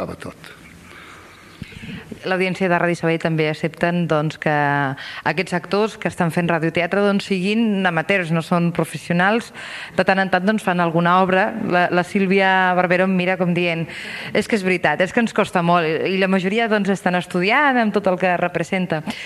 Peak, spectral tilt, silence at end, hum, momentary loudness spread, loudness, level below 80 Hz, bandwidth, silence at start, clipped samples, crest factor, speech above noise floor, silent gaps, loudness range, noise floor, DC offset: 0 dBFS; -6 dB/octave; 0 s; none; 9 LU; -19 LUFS; -56 dBFS; 13 kHz; 0 s; under 0.1%; 18 dB; 24 dB; none; 4 LU; -42 dBFS; under 0.1%